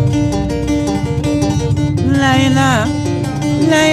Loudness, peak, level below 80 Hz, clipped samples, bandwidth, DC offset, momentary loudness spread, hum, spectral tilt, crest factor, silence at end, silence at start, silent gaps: -14 LUFS; -2 dBFS; -30 dBFS; under 0.1%; 14 kHz; under 0.1%; 6 LU; none; -5.5 dB/octave; 12 dB; 0 s; 0 s; none